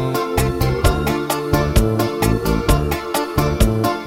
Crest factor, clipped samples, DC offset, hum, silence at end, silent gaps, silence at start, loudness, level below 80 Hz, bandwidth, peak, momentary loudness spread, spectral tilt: 16 dB; under 0.1%; under 0.1%; none; 0 s; none; 0 s; -18 LUFS; -24 dBFS; 17 kHz; -2 dBFS; 3 LU; -5.5 dB/octave